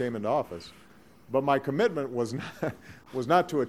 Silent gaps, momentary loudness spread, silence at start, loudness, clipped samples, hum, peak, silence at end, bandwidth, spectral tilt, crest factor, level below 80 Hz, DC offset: none; 14 LU; 0 s; -29 LUFS; under 0.1%; none; -10 dBFS; 0 s; 15.5 kHz; -6.5 dB/octave; 20 dB; -66 dBFS; 0.1%